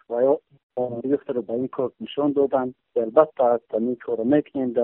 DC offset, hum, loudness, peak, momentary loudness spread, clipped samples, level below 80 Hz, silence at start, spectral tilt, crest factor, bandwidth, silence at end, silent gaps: under 0.1%; none; -23 LUFS; -2 dBFS; 8 LU; under 0.1%; -66 dBFS; 0.1 s; -6 dB/octave; 20 dB; 3.9 kHz; 0 s; 0.63-0.70 s